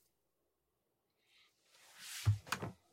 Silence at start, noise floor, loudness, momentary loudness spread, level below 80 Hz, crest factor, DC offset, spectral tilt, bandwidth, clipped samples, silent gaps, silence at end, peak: 1.95 s; -85 dBFS; -40 LUFS; 17 LU; -68 dBFS; 22 dB; under 0.1%; -4.5 dB/octave; 16 kHz; under 0.1%; none; 0.2 s; -22 dBFS